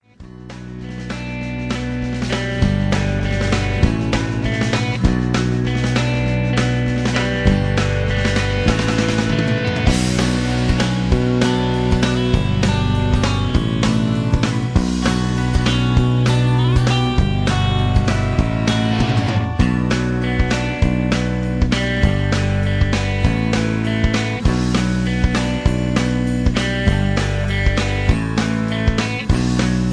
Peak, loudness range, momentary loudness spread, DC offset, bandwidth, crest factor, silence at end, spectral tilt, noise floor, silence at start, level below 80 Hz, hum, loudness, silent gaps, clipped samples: -2 dBFS; 2 LU; 3 LU; under 0.1%; 11 kHz; 16 dB; 0 s; -6 dB/octave; -37 dBFS; 0.2 s; -24 dBFS; none; -18 LUFS; none; under 0.1%